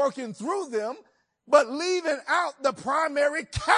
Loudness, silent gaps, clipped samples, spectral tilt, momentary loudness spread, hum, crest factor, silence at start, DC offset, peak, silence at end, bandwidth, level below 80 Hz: -26 LUFS; none; under 0.1%; -3.5 dB/octave; 10 LU; none; 22 dB; 0 s; under 0.1%; -4 dBFS; 0 s; 10.5 kHz; -52 dBFS